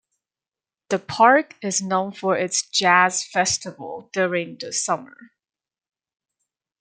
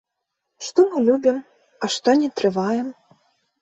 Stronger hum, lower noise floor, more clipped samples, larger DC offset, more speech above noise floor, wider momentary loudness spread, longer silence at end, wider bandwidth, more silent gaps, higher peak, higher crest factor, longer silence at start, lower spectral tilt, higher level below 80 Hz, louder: neither; first, under -90 dBFS vs -79 dBFS; neither; neither; first, over 69 dB vs 60 dB; about the same, 12 LU vs 12 LU; first, 1.55 s vs 0.7 s; first, 10 kHz vs 8.4 kHz; neither; about the same, -2 dBFS vs -4 dBFS; about the same, 22 dB vs 18 dB; first, 0.9 s vs 0.6 s; second, -2.5 dB/octave vs -4.5 dB/octave; about the same, -68 dBFS vs -66 dBFS; about the same, -21 LUFS vs -20 LUFS